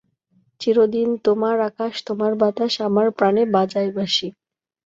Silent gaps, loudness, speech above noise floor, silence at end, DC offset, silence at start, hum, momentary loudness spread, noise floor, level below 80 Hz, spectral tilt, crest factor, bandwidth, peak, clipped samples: none; -20 LUFS; 44 dB; 0.55 s; under 0.1%; 0.6 s; none; 7 LU; -63 dBFS; -66 dBFS; -5.5 dB/octave; 16 dB; 7.8 kHz; -4 dBFS; under 0.1%